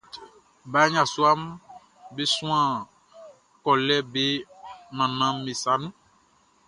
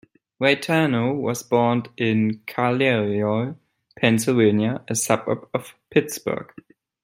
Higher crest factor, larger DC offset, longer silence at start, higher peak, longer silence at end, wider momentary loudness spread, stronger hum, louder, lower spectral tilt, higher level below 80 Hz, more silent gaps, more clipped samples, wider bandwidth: about the same, 20 dB vs 20 dB; neither; second, 0.15 s vs 0.4 s; second, -6 dBFS vs -2 dBFS; first, 0.75 s vs 0.6 s; first, 22 LU vs 9 LU; neither; about the same, -24 LUFS vs -22 LUFS; second, -3.5 dB/octave vs -5 dB/octave; about the same, -68 dBFS vs -64 dBFS; neither; neither; second, 11.5 kHz vs 16 kHz